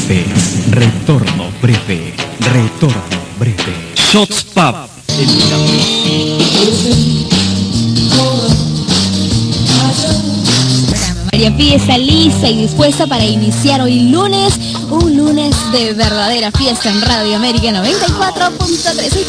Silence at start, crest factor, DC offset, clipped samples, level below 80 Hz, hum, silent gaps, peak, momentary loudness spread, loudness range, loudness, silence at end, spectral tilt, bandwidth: 0 s; 12 dB; under 0.1%; under 0.1%; -28 dBFS; none; none; 0 dBFS; 5 LU; 3 LU; -11 LUFS; 0 s; -4.5 dB/octave; 11 kHz